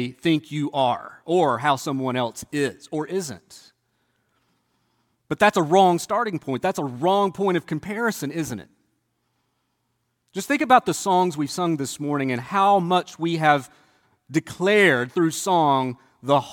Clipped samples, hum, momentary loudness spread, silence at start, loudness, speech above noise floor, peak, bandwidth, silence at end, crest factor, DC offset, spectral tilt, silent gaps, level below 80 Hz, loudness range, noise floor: under 0.1%; none; 12 LU; 0 s; -22 LUFS; 52 dB; -2 dBFS; 17.5 kHz; 0 s; 20 dB; under 0.1%; -5 dB/octave; none; -66 dBFS; 7 LU; -73 dBFS